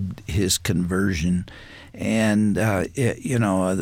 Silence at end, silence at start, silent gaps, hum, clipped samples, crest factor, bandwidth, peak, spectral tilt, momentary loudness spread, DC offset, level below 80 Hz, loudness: 0 s; 0 s; none; none; under 0.1%; 14 dB; 17 kHz; -8 dBFS; -5 dB/octave; 9 LU; under 0.1%; -42 dBFS; -22 LUFS